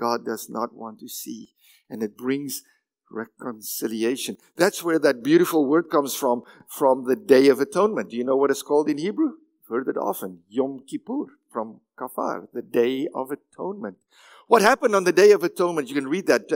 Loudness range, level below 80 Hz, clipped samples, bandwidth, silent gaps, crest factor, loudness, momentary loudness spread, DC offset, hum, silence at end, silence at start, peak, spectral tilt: 9 LU; -76 dBFS; under 0.1%; 16.5 kHz; none; 20 dB; -23 LUFS; 17 LU; under 0.1%; none; 0 s; 0 s; -2 dBFS; -4.5 dB/octave